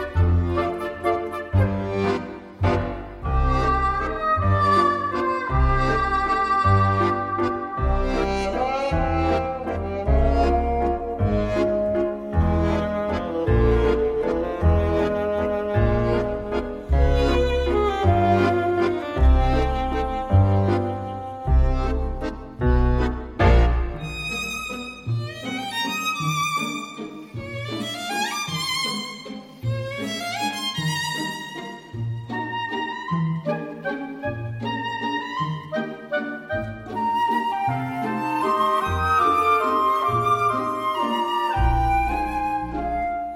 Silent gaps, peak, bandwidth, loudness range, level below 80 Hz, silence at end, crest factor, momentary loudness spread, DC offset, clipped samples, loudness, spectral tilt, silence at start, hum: none; -6 dBFS; 16 kHz; 7 LU; -28 dBFS; 0 s; 16 dB; 10 LU; under 0.1%; under 0.1%; -23 LUFS; -6 dB/octave; 0 s; none